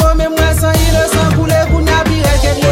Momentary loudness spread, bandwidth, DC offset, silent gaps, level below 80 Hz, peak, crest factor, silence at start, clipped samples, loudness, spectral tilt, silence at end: 1 LU; 17 kHz; under 0.1%; none; -16 dBFS; 0 dBFS; 10 dB; 0 s; under 0.1%; -12 LUFS; -5 dB/octave; 0 s